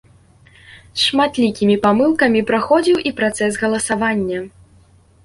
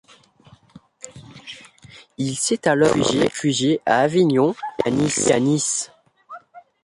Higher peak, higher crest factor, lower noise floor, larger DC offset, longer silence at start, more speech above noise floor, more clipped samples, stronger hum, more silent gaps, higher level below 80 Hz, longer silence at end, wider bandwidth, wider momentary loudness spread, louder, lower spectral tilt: about the same, -2 dBFS vs -4 dBFS; about the same, 16 dB vs 18 dB; about the same, -50 dBFS vs -52 dBFS; neither; about the same, 0.7 s vs 0.75 s; about the same, 34 dB vs 33 dB; neither; neither; neither; about the same, -52 dBFS vs -56 dBFS; first, 0.75 s vs 0.25 s; about the same, 11.5 kHz vs 11.5 kHz; second, 8 LU vs 23 LU; first, -16 LUFS vs -19 LUFS; about the same, -4 dB/octave vs -4 dB/octave